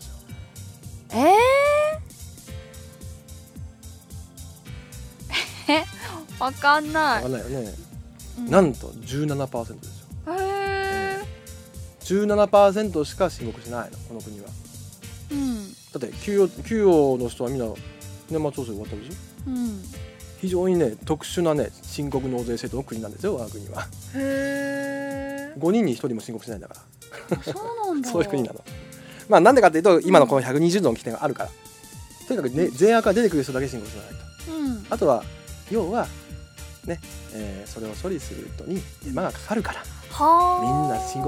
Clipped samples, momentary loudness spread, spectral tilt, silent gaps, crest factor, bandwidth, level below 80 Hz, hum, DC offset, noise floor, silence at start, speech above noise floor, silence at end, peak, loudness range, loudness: under 0.1%; 23 LU; -5.5 dB/octave; none; 24 dB; 17 kHz; -46 dBFS; none; under 0.1%; -43 dBFS; 0 s; 20 dB; 0 s; 0 dBFS; 12 LU; -23 LUFS